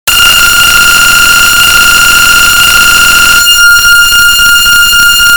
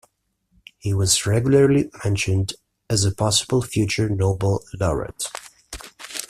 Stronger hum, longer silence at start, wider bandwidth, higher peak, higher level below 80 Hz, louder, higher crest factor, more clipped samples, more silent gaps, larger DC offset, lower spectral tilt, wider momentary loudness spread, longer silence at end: neither; second, 0.05 s vs 0.85 s; first, over 20 kHz vs 14.5 kHz; first, 0 dBFS vs -4 dBFS; first, -24 dBFS vs -44 dBFS; first, -1 LUFS vs -21 LUFS; second, 4 dB vs 18 dB; first, 20% vs under 0.1%; neither; neither; second, 1 dB/octave vs -4.5 dB/octave; second, 1 LU vs 17 LU; about the same, 0 s vs 0.05 s